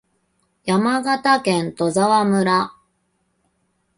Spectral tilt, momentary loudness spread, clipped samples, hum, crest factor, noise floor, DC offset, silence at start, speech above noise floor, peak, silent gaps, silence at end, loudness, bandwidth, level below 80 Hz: -5 dB/octave; 5 LU; under 0.1%; none; 16 dB; -68 dBFS; under 0.1%; 0.65 s; 50 dB; -4 dBFS; none; 1.25 s; -18 LUFS; 11.5 kHz; -62 dBFS